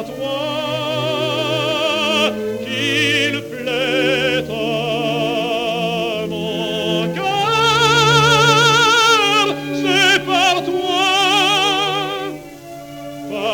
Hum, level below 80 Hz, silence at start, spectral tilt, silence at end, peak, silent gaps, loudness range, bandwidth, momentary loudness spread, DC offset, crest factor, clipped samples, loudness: none; -50 dBFS; 0 s; -3.5 dB/octave; 0 s; -2 dBFS; none; 6 LU; 17.5 kHz; 12 LU; under 0.1%; 16 dB; under 0.1%; -15 LUFS